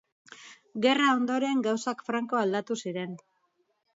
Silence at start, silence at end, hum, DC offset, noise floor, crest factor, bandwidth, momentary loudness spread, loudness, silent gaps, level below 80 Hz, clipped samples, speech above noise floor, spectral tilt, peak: 0.3 s; 0.8 s; none; under 0.1%; -74 dBFS; 20 dB; 7.8 kHz; 18 LU; -28 LUFS; none; -80 dBFS; under 0.1%; 46 dB; -4.5 dB/octave; -10 dBFS